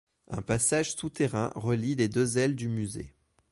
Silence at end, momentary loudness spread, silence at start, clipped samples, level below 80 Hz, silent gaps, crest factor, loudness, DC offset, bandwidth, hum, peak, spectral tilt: 0.4 s; 13 LU; 0.3 s; under 0.1%; -54 dBFS; none; 16 dB; -29 LUFS; under 0.1%; 11.5 kHz; none; -14 dBFS; -5 dB/octave